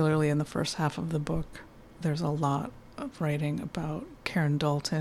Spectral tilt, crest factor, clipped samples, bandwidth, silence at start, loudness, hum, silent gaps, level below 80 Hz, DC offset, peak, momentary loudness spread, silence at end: -6.5 dB/octave; 16 dB; under 0.1%; 13 kHz; 0 s; -31 LUFS; none; none; -52 dBFS; under 0.1%; -14 dBFS; 11 LU; 0 s